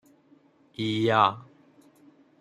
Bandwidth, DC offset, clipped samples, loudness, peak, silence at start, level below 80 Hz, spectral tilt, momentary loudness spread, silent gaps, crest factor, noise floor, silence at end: 12 kHz; under 0.1%; under 0.1%; -25 LUFS; -6 dBFS; 0.8 s; -70 dBFS; -6 dB/octave; 23 LU; none; 22 dB; -60 dBFS; 1 s